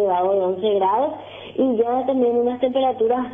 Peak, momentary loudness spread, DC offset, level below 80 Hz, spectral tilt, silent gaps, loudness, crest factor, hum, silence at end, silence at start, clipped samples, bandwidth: -6 dBFS; 4 LU; under 0.1%; -60 dBFS; -9 dB/octave; none; -20 LUFS; 12 dB; none; 0 s; 0 s; under 0.1%; 3.7 kHz